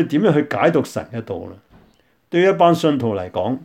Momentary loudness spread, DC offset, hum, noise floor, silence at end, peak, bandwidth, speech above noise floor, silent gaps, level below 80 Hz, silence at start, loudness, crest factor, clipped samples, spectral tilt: 15 LU; under 0.1%; none; -57 dBFS; 0 s; -2 dBFS; 16 kHz; 39 dB; none; -58 dBFS; 0 s; -18 LUFS; 18 dB; under 0.1%; -7 dB/octave